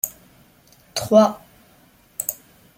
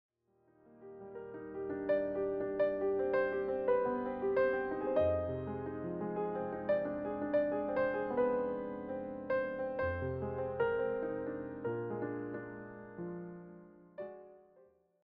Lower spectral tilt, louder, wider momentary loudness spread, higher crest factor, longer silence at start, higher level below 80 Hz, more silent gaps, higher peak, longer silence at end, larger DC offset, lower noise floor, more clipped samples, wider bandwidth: second, -4.5 dB/octave vs -6.5 dB/octave; first, -20 LUFS vs -36 LUFS; first, 23 LU vs 16 LU; first, 22 dB vs 16 dB; second, 0.05 s vs 0.7 s; about the same, -60 dBFS vs -62 dBFS; neither; first, -2 dBFS vs -20 dBFS; second, 0.45 s vs 0.65 s; neither; second, -54 dBFS vs -72 dBFS; neither; first, 17 kHz vs 5.2 kHz